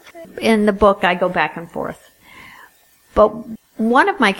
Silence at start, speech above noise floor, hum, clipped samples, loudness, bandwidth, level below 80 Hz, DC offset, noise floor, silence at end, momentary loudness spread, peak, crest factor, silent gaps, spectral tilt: 0.05 s; 35 dB; none; under 0.1%; -17 LUFS; 17 kHz; -42 dBFS; under 0.1%; -52 dBFS; 0 s; 15 LU; 0 dBFS; 18 dB; none; -5.5 dB/octave